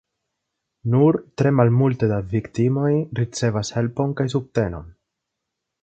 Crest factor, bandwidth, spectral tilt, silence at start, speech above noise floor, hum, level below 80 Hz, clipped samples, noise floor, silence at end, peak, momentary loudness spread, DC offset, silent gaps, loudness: 20 dB; 8.8 kHz; -7.5 dB/octave; 0.85 s; 61 dB; none; -48 dBFS; under 0.1%; -81 dBFS; 0.95 s; -2 dBFS; 8 LU; under 0.1%; none; -21 LUFS